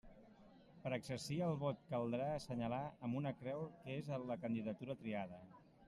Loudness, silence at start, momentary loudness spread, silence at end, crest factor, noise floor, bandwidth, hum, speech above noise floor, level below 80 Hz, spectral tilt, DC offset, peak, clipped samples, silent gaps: -44 LUFS; 0.05 s; 7 LU; 0 s; 16 dB; -65 dBFS; 13.5 kHz; none; 21 dB; -72 dBFS; -7 dB/octave; under 0.1%; -28 dBFS; under 0.1%; none